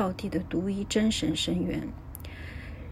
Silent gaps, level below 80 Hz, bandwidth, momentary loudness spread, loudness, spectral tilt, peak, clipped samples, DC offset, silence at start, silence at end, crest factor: none; -46 dBFS; 15.5 kHz; 15 LU; -29 LUFS; -5 dB/octave; -14 dBFS; under 0.1%; under 0.1%; 0 s; 0 s; 16 dB